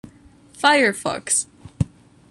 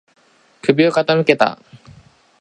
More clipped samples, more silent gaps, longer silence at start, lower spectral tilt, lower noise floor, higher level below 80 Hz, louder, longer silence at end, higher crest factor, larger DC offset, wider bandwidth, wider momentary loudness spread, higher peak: neither; neither; about the same, 0.6 s vs 0.65 s; second, -3 dB/octave vs -6 dB/octave; about the same, -49 dBFS vs -47 dBFS; first, -46 dBFS vs -62 dBFS; second, -20 LUFS vs -16 LUFS; second, 0.45 s vs 0.65 s; about the same, 20 dB vs 18 dB; neither; first, 13 kHz vs 10.5 kHz; first, 12 LU vs 7 LU; about the same, -2 dBFS vs 0 dBFS